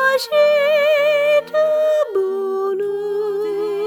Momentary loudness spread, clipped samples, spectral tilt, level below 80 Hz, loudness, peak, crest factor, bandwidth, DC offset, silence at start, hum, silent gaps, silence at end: 7 LU; under 0.1%; -3 dB/octave; -72 dBFS; -17 LUFS; -4 dBFS; 12 dB; 18.5 kHz; under 0.1%; 0 s; none; none; 0 s